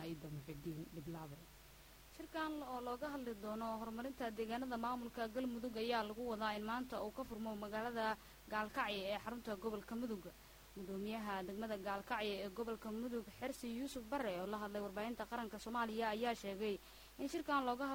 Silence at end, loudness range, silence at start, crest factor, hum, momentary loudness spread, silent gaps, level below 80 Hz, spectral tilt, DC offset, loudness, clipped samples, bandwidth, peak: 0 s; 3 LU; 0 s; 18 dB; none; 10 LU; none; -66 dBFS; -5 dB/octave; under 0.1%; -44 LUFS; under 0.1%; 17.5 kHz; -26 dBFS